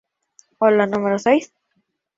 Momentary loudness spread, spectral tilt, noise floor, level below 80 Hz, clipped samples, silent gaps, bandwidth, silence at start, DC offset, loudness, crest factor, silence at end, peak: 3 LU; -6 dB/octave; -70 dBFS; -64 dBFS; under 0.1%; none; 7.8 kHz; 0.6 s; under 0.1%; -18 LUFS; 18 dB; 0.7 s; -2 dBFS